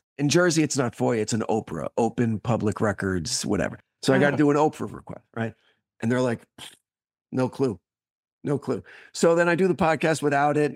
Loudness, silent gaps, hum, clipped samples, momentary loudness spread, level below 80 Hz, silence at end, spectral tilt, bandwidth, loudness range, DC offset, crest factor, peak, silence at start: -24 LUFS; 7.21-7.25 s, 8.11-8.23 s, 8.32-8.39 s; none; under 0.1%; 14 LU; -58 dBFS; 0 s; -5 dB/octave; 15.5 kHz; 6 LU; under 0.1%; 18 dB; -6 dBFS; 0.2 s